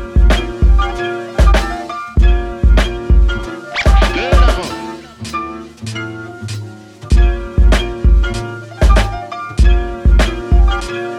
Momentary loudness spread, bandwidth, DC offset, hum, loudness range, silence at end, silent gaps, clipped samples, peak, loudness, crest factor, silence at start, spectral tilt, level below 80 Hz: 13 LU; 10.5 kHz; under 0.1%; none; 4 LU; 0 s; none; under 0.1%; -2 dBFS; -15 LUFS; 12 dB; 0 s; -6 dB/octave; -14 dBFS